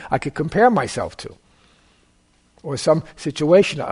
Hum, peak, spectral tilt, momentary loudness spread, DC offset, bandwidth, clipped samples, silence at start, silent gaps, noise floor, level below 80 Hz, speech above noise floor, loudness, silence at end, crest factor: none; -2 dBFS; -5.5 dB/octave; 18 LU; under 0.1%; 11 kHz; under 0.1%; 0 s; none; -59 dBFS; -50 dBFS; 40 dB; -19 LUFS; 0 s; 18 dB